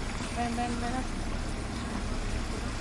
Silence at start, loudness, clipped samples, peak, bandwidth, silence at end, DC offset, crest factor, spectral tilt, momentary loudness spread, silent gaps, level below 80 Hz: 0 s; -34 LUFS; under 0.1%; -18 dBFS; 11.5 kHz; 0 s; under 0.1%; 14 dB; -5 dB/octave; 4 LU; none; -36 dBFS